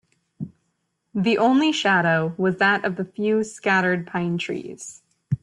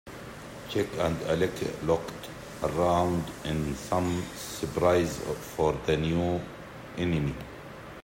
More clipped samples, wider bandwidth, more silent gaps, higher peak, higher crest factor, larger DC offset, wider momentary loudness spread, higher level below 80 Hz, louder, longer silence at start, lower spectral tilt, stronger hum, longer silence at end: neither; second, 11.5 kHz vs 16.5 kHz; neither; about the same, -8 dBFS vs -10 dBFS; about the same, 16 dB vs 20 dB; neither; about the same, 19 LU vs 17 LU; second, -64 dBFS vs -50 dBFS; first, -21 LUFS vs -29 LUFS; first, 0.4 s vs 0.05 s; about the same, -5.5 dB/octave vs -6 dB/octave; neither; about the same, 0.05 s vs 0 s